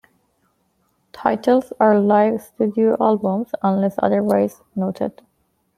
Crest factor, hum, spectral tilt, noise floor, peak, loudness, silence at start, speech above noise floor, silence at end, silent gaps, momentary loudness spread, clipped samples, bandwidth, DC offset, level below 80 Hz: 18 dB; none; -8 dB/octave; -66 dBFS; -2 dBFS; -19 LUFS; 1.15 s; 48 dB; 0.7 s; none; 8 LU; under 0.1%; 14.5 kHz; under 0.1%; -64 dBFS